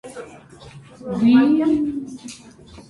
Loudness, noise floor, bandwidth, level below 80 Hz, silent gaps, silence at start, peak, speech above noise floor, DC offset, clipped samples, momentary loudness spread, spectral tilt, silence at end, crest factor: -18 LUFS; -43 dBFS; 11.5 kHz; -54 dBFS; none; 0.05 s; -4 dBFS; 24 dB; under 0.1%; under 0.1%; 24 LU; -6.5 dB/octave; 0.1 s; 16 dB